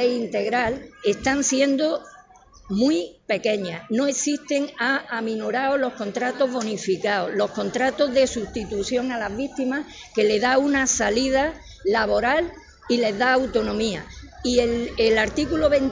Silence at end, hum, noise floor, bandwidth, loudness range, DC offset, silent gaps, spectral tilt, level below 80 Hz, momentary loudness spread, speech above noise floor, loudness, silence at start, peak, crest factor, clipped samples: 0 s; none; -50 dBFS; 7.6 kHz; 3 LU; under 0.1%; none; -3.5 dB/octave; -46 dBFS; 8 LU; 28 dB; -23 LUFS; 0 s; -6 dBFS; 16 dB; under 0.1%